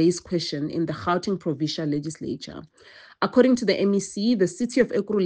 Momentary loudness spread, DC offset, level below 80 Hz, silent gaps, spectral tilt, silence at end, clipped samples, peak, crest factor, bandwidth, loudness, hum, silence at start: 12 LU; under 0.1%; -60 dBFS; none; -5.5 dB/octave; 0 s; under 0.1%; -4 dBFS; 18 dB; 9.8 kHz; -24 LUFS; none; 0 s